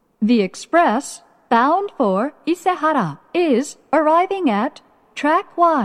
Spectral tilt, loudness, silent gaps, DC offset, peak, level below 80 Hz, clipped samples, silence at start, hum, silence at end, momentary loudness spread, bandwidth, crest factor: -5.5 dB/octave; -18 LUFS; none; under 0.1%; -2 dBFS; -70 dBFS; under 0.1%; 0.2 s; none; 0 s; 7 LU; 13.5 kHz; 16 dB